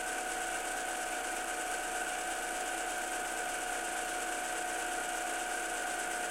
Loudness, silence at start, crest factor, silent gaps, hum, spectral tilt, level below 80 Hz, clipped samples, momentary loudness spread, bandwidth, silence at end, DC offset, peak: -35 LUFS; 0 s; 14 dB; none; none; 0 dB/octave; -60 dBFS; under 0.1%; 1 LU; 16.5 kHz; 0 s; under 0.1%; -22 dBFS